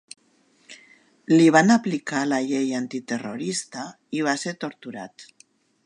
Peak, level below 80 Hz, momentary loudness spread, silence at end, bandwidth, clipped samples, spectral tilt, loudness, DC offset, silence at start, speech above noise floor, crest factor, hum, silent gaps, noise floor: -2 dBFS; -76 dBFS; 21 LU; 0.65 s; 11 kHz; under 0.1%; -5 dB/octave; -22 LUFS; under 0.1%; 0.7 s; 40 dB; 22 dB; none; none; -62 dBFS